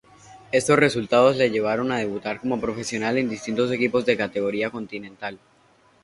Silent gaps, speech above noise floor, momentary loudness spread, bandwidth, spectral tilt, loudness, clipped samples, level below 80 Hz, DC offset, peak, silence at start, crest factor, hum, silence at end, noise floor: none; 36 dB; 14 LU; 11.5 kHz; -5 dB/octave; -22 LUFS; under 0.1%; -58 dBFS; under 0.1%; -2 dBFS; 0.3 s; 20 dB; none; 0.65 s; -58 dBFS